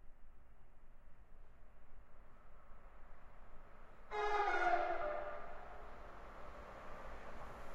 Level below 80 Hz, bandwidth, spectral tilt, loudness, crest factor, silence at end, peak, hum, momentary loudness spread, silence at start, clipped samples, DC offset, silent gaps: -56 dBFS; 7.6 kHz; -5 dB/octave; -42 LUFS; 20 dB; 0 s; -24 dBFS; none; 27 LU; 0 s; under 0.1%; under 0.1%; none